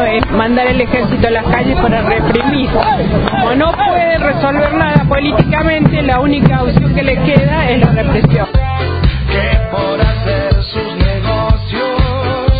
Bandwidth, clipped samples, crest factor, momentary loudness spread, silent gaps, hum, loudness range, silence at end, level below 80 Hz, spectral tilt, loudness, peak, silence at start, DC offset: 5 kHz; 0.2%; 12 dB; 4 LU; none; none; 3 LU; 0 s; -20 dBFS; -10 dB/octave; -12 LUFS; 0 dBFS; 0 s; under 0.1%